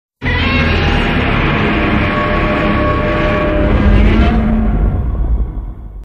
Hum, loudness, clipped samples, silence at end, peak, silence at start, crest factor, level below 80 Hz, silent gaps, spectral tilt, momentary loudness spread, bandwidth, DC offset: none; -13 LUFS; under 0.1%; 0 s; 0 dBFS; 0.2 s; 12 dB; -16 dBFS; none; -8 dB/octave; 7 LU; 6.8 kHz; under 0.1%